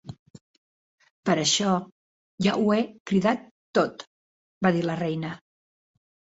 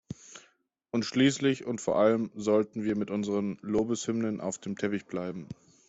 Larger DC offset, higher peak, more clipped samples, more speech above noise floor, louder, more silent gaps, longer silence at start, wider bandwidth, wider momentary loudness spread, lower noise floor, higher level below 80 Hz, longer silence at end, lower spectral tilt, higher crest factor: neither; first, -6 dBFS vs -10 dBFS; neither; first, over 66 dB vs 38 dB; first, -25 LUFS vs -29 LUFS; first, 0.19-0.34 s, 0.41-0.98 s, 1.11-1.23 s, 1.92-2.38 s, 3.00-3.05 s, 3.51-3.73 s, 4.07-4.61 s vs none; about the same, 0.05 s vs 0.1 s; about the same, 8 kHz vs 8.2 kHz; about the same, 11 LU vs 13 LU; first, under -90 dBFS vs -67 dBFS; about the same, -64 dBFS vs -64 dBFS; first, 0.95 s vs 0.35 s; about the same, -4.5 dB/octave vs -5.5 dB/octave; about the same, 20 dB vs 18 dB